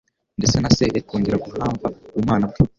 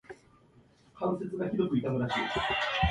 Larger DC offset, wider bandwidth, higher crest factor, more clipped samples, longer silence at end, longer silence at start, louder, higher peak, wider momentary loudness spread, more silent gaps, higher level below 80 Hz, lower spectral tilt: neither; second, 7.6 kHz vs 11 kHz; about the same, 18 dB vs 18 dB; neither; about the same, 0.1 s vs 0 s; first, 0.4 s vs 0.1 s; first, -21 LUFS vs -31 LUFS; first, -2 dBFS vs -14 dBFS; first, 9 LU vs 5 LU; neither; first, -38 dBFS vs -46 dBFS; about the same, -5.5 dB/octave vs -6 dB/octave